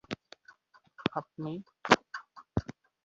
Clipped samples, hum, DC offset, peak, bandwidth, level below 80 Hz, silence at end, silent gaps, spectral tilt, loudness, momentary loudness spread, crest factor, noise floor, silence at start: under 0.1%; none; under 0.1%; -2 dBFS; 7.4 kHz; -56 dBFS; 0.35 s; none; -3 dB/octave; -33 LUFS; 18 LU; 32 dB; -61 dBFS; 0.1 s